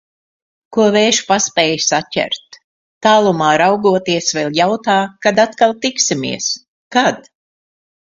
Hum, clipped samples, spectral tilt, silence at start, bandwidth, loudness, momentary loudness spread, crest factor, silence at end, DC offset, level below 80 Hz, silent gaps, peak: none; under 0.1%; -3 dB/octave; 0.7 s; 7.8 kHz; -14 LUFS; 8 LU; 16 dB; 0.9 s; under 0.1%; -58 dBFS; 2.64-3.01 s, 6.68-6.91 s; 0 dBFS